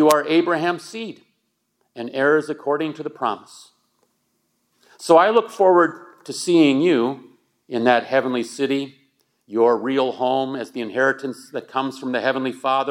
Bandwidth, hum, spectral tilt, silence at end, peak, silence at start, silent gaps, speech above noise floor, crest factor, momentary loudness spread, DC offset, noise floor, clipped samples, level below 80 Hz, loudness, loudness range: 16.5 kHz; none; -4.5 dB/octave; 0 s; 0 dBFS; 0 s; none; 52 dB; 20 dB; 16 LU; under 0.1%; -71 dBFS; under 0.1%; -82 dBFS; -20 LUFS; 7 LU